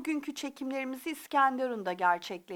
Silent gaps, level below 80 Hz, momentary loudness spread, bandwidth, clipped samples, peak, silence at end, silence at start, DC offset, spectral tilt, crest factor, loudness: none; -82 dBFS; 10 LU; 19.5 kHz; under 0.1%; -14 dBFS; 0 s; 0 s; under 0.1%; -3.5 dB/octave; 18 dB; -32 LUFS